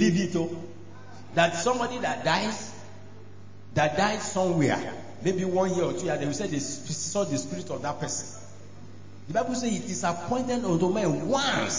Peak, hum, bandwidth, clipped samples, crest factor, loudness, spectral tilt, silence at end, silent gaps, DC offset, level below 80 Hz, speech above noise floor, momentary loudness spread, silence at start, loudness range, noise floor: -10 dBFS; none; 7.8 kHz; under 0.1%; 20 dB; -27 LUFS; -4.5 dB/octave; 0 s; none; 0.8%; -58 dBFS; 21 dB; 22 LU; 0 s; 4 LU; -47 dBFS